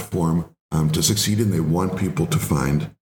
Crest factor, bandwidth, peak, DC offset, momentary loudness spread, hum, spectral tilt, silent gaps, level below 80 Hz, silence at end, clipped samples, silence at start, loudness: 16 dB; 19 kHz; -4 dBFS; under 0.1%; 5 LU; none; -5 dB/octave; 0.61-0.69 s; -42 dBFS; 0.1 s; under 0.1%; 0 s; -21 LUFS